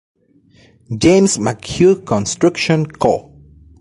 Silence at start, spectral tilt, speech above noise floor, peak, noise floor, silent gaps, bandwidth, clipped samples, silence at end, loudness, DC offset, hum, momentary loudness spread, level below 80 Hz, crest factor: 0.9 s; -5 dB/octave; 37 dB; -2 dBFS; -51 dBFS; none; 11.5 kHz; under 0.1%; 0.6 s; -15 LUFS; under 0.1%; none; 8 LU; -42 dBFS; 14 dB